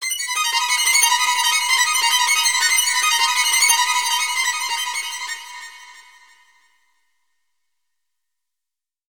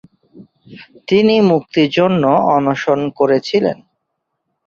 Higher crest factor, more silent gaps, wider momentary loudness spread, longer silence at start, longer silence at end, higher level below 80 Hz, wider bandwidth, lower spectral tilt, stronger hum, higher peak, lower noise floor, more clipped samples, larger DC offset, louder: first, 20 dB vs 14 dB; neither; first, 13 LU vs 5 LU; second, 0 s vs 0.35 s; first, 3.1 s vs 0.95 s; second, -82 dBFS vs -56 dBFS; first, over 20 kHz vs 7 kHz; second, 6.5 dB/octave vs -7 dB/octave; neither; about the same, -2 dBFS vs -2 dBFS; first, -87 dBFS vs -73 dBFS; neither; first, 0.2% vs under 0.1%; about the same, -16 LUFS vs -14 LUFS